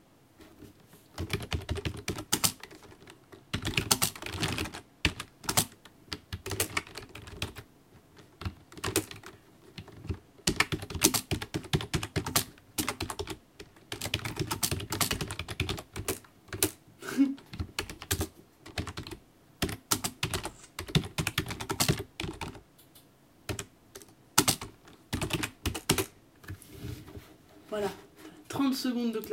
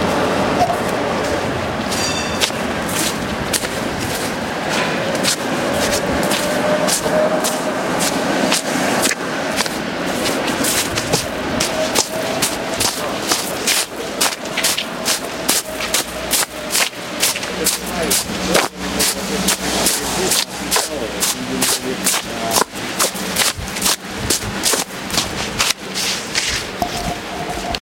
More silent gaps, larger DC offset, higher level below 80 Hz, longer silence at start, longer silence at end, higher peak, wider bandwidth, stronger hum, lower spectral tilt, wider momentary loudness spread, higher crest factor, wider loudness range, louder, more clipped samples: neither; neither; second, -50 dBFS vs -42 dBFS; first, 0.4 s vs 0 s; about the same, 0 s vs 0.05 s; about the same, -2 dBFS vs 0 dBFS; about the same, 17 kHz vs 17 kHz; neither; about the same, -3 dB/octave vs -2 dB/octave; first, 20 LU vs 5 LU; first, 32 dB vs 20 dB; first, 5 LU vs 2 LU; second, -32 LUFS vs -18 LUFS; neither